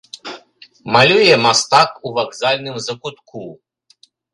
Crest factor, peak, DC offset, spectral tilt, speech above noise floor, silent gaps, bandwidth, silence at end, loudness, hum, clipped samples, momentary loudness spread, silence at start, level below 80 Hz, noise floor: 18 dB; 0 dBFS; under 0.1%; -3 dB/octave; 38 dB; none; 11.5 kHz; 0.8 s; -14 LUFS; none; under 0.1%; 23 LU; 0.25 s; -58 dBFS; -54 dBFS